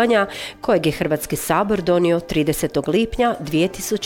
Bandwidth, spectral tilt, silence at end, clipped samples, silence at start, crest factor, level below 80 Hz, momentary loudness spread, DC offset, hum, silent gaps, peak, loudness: 18 kHz; -5 dB/octave; 0 s; under 0.1%; 0 s; 14 dB; -42 dBFS; 4 LU; under 0.1%; none; none; -6 dBFS; -20 LUFS